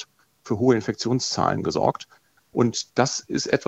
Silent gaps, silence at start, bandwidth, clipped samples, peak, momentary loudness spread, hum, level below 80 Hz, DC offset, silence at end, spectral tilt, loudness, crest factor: none; 0 s; 8.4 kHz; under 0.1%; -4 dBFS; 10 LU; none; -58 dBFS; under 0.1%; 0.05 s; -4.5 dB/octave; -23 LUFS; 20 dB